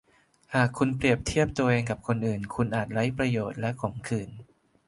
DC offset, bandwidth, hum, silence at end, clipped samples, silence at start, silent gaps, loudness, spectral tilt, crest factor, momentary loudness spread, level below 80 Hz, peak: under 0.1%; 11.5 kHz; none; 0.45 s; under 0.1%; 0.5 s; none; -28 LUFS; -6.5 dB/octave; 20 dB; 8 LU; -50 dBFS; -8 dBFS